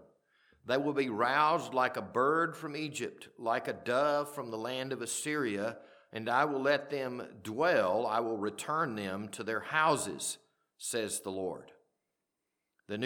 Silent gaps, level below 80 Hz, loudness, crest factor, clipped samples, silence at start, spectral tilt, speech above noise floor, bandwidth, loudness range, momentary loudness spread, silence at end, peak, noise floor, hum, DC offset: none; -82 dBFS; -33 LUFS; 20 dB; under 0.1%; 0.65 s; -3.5 dB/octave; 53 dB; 19 kHz; 3 LU; 12 LU; 0 s; -12 dBFS; -86 dBFS; none; under 0.1%